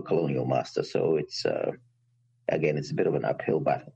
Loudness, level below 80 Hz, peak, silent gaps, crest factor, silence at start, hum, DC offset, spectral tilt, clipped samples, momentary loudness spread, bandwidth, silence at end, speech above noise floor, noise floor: -28 LUFS; -64 dBFS; -12 dBFS; none; 16 dB; 0 s; none; under 0.1%; -6.5 dB/octave; under 0.1%; 5 LU; 8.6 kHz; 0.05 s; 41 dB; -68 dBFS